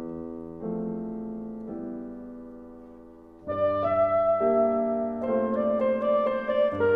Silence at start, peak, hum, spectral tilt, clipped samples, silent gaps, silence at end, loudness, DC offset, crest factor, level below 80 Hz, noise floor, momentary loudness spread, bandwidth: 0 s; -12 dBFS; none; -9.5 dB/octave; under 0.1%; none; 0 s; -27 LUFS; under 0.1%; 14 dB; -58 dBFS; -48 dBFS; 19 LU; 5 kHz